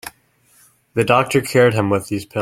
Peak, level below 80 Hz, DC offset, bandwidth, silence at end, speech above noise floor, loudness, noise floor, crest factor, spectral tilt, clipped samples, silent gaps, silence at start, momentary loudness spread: 0 dBFS; -54 dBFS; under 0.1%; 16 kHz; 0 s; 40 dB; -17 LUFS; -56 dBFS; 18 dB; -5.5 dB/octave; under 0.1%; none; 0.05 s; 11 LU